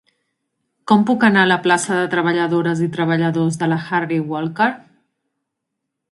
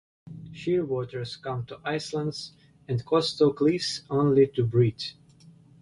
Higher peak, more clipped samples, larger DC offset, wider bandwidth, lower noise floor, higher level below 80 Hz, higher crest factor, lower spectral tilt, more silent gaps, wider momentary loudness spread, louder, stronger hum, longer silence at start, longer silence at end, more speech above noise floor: first, 0 dBFS vs -10 dBFS; neither; neither; about the same, 11.5 kHz vs 11.5 kHz; first, -78 dBFS vs -54 dBFS; about the same, -64 dBFS vs -60 dBFS; about the same, 18 dB vs 18 dB; about the same, -5.5 dB/octave vs -6.5 dB/octave; neither; second, 8 LU vs 15 LU; first, -17 LUFS vs -26 LUFS; neither; first, 0.85 s vs 0.25 s; first, 1.3 s vs 0.3 s; first, 61 dB vs 28 dB